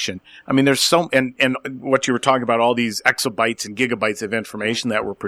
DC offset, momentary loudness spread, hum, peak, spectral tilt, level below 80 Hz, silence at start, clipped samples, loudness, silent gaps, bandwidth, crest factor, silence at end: under 0.1%; 8 LU; none; -2 dBFS; -3.5 dB/octave; -60 dBFS; 0 s; under 0.1%; -19 LUFS; none; 16 kHz; 18 dB; 0 s